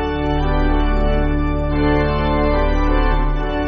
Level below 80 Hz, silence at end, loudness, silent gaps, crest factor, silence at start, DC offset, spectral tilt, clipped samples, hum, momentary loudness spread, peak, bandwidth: -18 dBFS; 0 s; -19 LUFS; none; 12 dB; 0 s; under 0.1%; -6 dB/octave; under 0.1%; none; 3 LU; -4 dBFS; 5.4 kHz